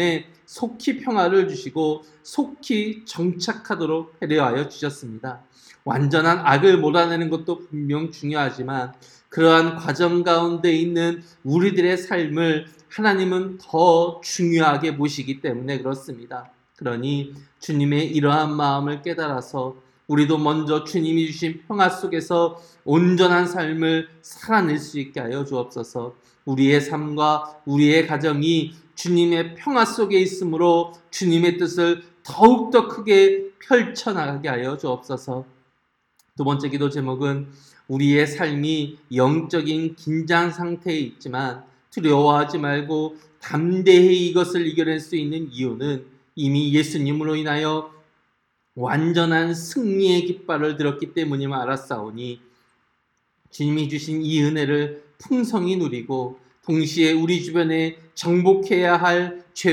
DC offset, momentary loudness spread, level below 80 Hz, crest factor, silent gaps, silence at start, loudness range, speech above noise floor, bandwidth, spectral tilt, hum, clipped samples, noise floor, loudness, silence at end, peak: under 0.1%; 13 LU; -68 dBFS; 20 dB; none; 0 s; 6 LU; 49 dB; 13 kHz; -6 dB/octave; none; under 0.1%; -69 dBFS; -21 LUFS; 0 s; 0 dBFS